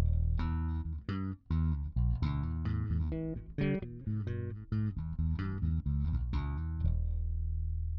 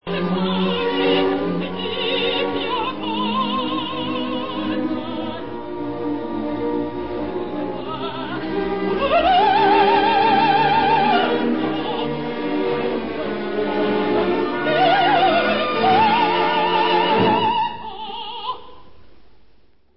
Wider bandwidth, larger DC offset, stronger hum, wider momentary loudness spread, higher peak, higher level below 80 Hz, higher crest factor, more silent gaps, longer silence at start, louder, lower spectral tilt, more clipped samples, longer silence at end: about the same, 5.4 kHz vs 5.8 kHz; second, under 0.1% vs 1%; neither; second, 5 LU vs 12 LU; second, -20 dBFS vs -4 dBFS; first, -36 dBFS vs -50 dBFS; about the same, 14 dB vs 16 dB; neither; about the same, 0 s vs 0 s; second, -35 LUFS vs -20 LUFS; about the same, -9 dB/octave vs -10 dB/octave; neither; about the same, 0 s vs 0 s